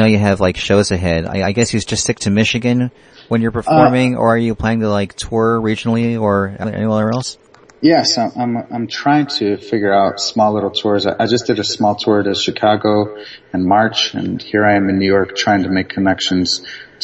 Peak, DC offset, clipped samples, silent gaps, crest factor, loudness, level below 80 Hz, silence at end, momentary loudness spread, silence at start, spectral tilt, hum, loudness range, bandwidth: 0 dBFS; under 0.1%; under 0.1%; none; 14 dB; -15 LUFS; -44 dBFS; 0 s; 7 LU; 0 s; -5 dB/octave; none; 2 LU; 10.5 kHz